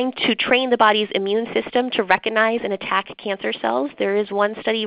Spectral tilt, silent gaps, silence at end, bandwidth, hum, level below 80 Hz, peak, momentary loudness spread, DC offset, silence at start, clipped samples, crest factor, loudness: -8 dB/octave; none; 0 s; 5.2 kHz; none; -60 dBFS; 0 dBFS; 7 LU; under 0.1%; 0 s; under 0.1%; 20 dB; -20 LUFS